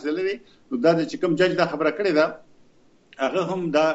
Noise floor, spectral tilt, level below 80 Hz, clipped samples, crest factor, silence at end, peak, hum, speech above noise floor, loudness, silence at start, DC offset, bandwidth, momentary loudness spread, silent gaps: -56 dBFS; -6 dB/octave; -68 dBFS; under 0.1%; 18 dB; 0 s; -6 dBFS; none; 34 dB; -23 LUFS; 0 s; under 0.1%; 8 kHz; 8 LU; none